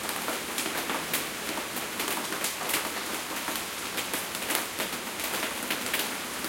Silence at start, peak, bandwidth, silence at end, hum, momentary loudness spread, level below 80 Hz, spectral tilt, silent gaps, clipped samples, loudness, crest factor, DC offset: 0 s; -6 dBFS; 17 kHz; 0 s; none; 3 LU; -62 dBFS; -1 dB/octave; none; under 0.1%; -30 LUFS; 26 dB; under 0.1%